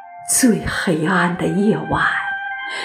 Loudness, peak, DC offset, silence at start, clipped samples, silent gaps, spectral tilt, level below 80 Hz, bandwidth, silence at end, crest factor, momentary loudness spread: -18 LUFS; -4 dBFS; under 0.1%; 0 s; under 0.1%; none; -4 dB/octave; -44 dBFS; 15.5 kHz; 0 s; 16 dB; 8 LU